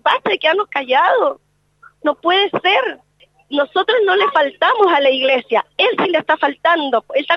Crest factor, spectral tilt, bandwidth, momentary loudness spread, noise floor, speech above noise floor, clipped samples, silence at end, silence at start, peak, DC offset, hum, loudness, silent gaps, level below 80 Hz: 16 dB; -4.5 dB/octave; 7 kHz; 7 LU; -49 dBFS; 34 dB; under 0.1%; 0 s; 0.05 s; 0 dBFS; under 0.1%; 50 Hz at -65 dBFS; -15 LUFS; none; -68 dBFS